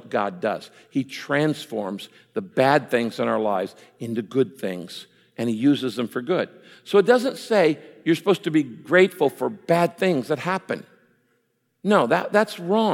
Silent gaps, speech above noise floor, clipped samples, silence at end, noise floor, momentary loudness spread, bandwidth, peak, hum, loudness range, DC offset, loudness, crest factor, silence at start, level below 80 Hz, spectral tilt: none; 48 dB; under 0.1%; 0 s; -70 dBFS; 13 LU; 16.5 kHz; -4 dBFS; none; 4 LU; under 0.1%; -23 LUFS; 20 dB; 0.05 s; -76 dBFS; -6 dB/octave